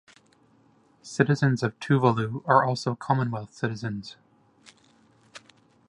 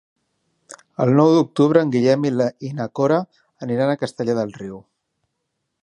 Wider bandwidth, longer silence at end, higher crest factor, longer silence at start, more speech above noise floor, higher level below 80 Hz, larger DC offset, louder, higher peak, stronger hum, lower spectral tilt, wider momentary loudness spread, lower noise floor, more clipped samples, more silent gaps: about the same, 11 kHz vs 11 kHz; second, 0.5 s vs 1.05 s; first, 24 dB vs 18 dB; first, 1.05 s vs 0.7 s; second, 36 dB vs 58 dB; about the same, -66 dBFS vs -64 dBFS; neither; second, -25 LUFS vs -19 LUFS; about the same, -4 dBFS vs -2 dBFS; neither; about the same, -7 dB/octave vs -7.5 dB/octave; second, 12 LU vs 18 LU; second, -61 dBFS vs -76 dBFS; neither; neither